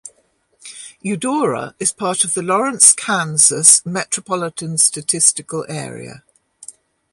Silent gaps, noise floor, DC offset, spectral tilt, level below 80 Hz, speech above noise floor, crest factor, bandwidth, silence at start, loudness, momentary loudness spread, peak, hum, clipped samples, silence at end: none; -61 dBFS; under 0.1%; -2 dB/octave; -64 dBFS; 44 dB; 18 dB; 16 kHz; 0.05 s; -14 LUFS; 18 LU; 0 dBFS; none; under 0.1%; 0.4 s